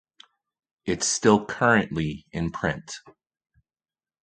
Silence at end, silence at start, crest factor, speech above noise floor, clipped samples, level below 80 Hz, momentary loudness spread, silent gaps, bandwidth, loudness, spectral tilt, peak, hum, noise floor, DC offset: 1.1 s; 0.85 s; 24 dB; over 66 dB; under 0.1%; -50 dBFS; 15 LU; none; 9.4 kHz; -24 LUFS; -4 dB/octave; -4 dBFS; none; under -90 dBFS; under 0.1%